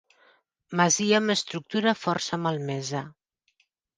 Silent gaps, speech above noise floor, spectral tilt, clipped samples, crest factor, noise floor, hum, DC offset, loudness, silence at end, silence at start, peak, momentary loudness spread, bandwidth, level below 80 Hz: none; 45 dB; -3.5 dB/octave; under 0.1%; 20 dB; -71 dBFS; none; under 0.1%; -26 LUFS; 0.85 s; 0.7 s; -6 dBFS; 11 LU; 10.5 kHz; -72 dBFS